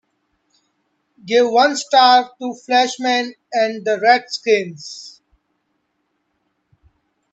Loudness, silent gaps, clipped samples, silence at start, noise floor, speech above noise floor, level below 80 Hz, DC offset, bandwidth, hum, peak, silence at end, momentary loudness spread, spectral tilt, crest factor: -16 LUFS; none; under 0.1%; 1.25 s; -70 dBFS; 54 dB; -70 dBFS; under 0.1%; 8.4 kHz; none; 0 dBFS; 2.25 s; 17 LU; -2.5 dB/octave; 18 dB